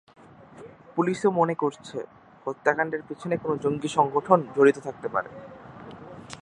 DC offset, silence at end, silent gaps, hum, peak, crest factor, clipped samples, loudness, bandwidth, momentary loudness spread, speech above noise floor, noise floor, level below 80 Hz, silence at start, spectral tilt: under 0.1%; 0.05 s; none; none; -2 dBFS; 24 dB; under 0.1%; -25 LUFS; 10.5 kHz; 22 LU; 23 dB; -47 dBFS; -66 dBFS; 0.55 s; -6.5 dB/octave